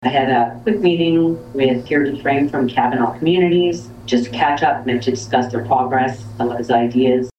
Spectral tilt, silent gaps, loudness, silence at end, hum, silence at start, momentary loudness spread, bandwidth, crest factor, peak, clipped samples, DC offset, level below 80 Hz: -6 dB/octave; none; -17 LUFS; 0.1 s; none; 0 s; 5 LU; 8.6 kHz; 14 dB; -2 dBFS; under 0.1%; under 0.1%; -50 dBFS